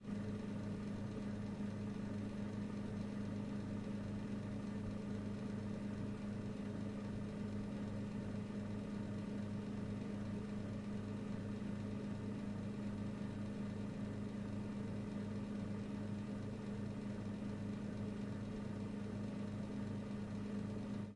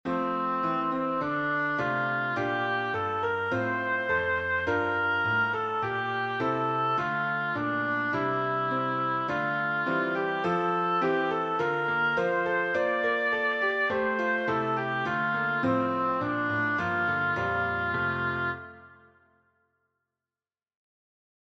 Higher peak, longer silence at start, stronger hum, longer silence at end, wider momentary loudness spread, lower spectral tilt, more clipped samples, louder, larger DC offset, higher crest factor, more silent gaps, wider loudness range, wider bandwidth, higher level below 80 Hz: second, -32 dBFS vs -14 dBFS; about the same, 0 s vs 0.05 s; neither; second, 0 s vs 2.55 s; about the same, 1 LU vs 3 LU; about the same, -8 dB/octave vs -7 dB/octave; neither; second, -45 LUFS vs -27 LUFS; neither; about the same, 12 dB vs 14 dB; neither; second, 0 LU vs 3 LU; first, 11 kHz vs 8 kHz; about the same, -62 dBFS vs -62 dBFS